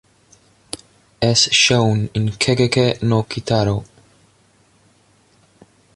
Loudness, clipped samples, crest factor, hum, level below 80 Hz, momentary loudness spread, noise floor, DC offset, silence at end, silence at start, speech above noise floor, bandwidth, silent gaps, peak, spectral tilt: -16 LUFS; under 0.1%; 18 dB; none; -46 dBFS; 20 LU; -56 dBFS; under 0.1%; 2.1 s; 0.75 s; 39 dB; 11.5 kHz; none; -2 dBFS; -4 dB/octave